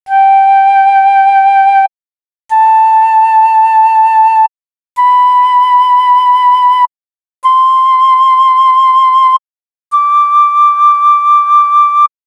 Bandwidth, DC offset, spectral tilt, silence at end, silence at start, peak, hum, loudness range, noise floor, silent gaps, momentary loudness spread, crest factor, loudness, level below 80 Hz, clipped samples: 11 kHz; under 0.1%; 2.5 dB/octave; 0.2 s; 0.05 s; 0 dBFS; none; 1 LU; under -90 dBFS; none; 5 LU; 8 dB; -7 LUFS; -74 dBFS; under 0.1%